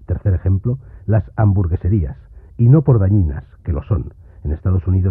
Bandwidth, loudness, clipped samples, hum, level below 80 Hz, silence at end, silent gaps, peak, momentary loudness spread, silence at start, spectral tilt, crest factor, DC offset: 2.8 kHz; -17 LUFS; under 0.1%; none; -28 dBFS; 0 s; none; -2 dBFS; 14 LU; 0.1 s; -14 dB/octave; 14 dB; under 0.1%